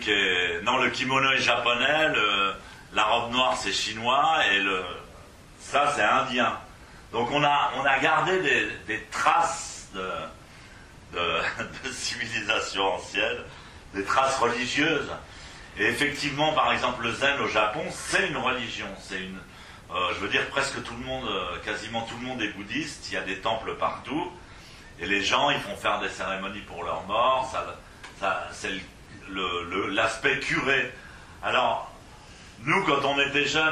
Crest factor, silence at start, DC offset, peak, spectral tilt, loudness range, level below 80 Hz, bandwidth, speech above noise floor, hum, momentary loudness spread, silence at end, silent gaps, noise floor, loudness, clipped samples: 20 dB; 0 s; under 0.1%; -8 dBFS; -3 dB/octave; 6 LU; -52 dBFS; 15 kHz; 22 dB; none; 14 LU; 0 s; none; -48 dBFS; -25 LUFS; under 0.1%